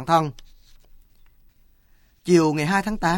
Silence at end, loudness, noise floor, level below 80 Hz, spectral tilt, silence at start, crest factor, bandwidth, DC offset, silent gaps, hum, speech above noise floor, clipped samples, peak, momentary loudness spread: 0 s; -21 LUFS; -57 dBFS; -46 dBFS; -6 dB/octave; 0 s; 18 dB; 17 kHz; under 0.1%; none; none; 37 dB; under 0.1%; -4 dBFS; 12 LU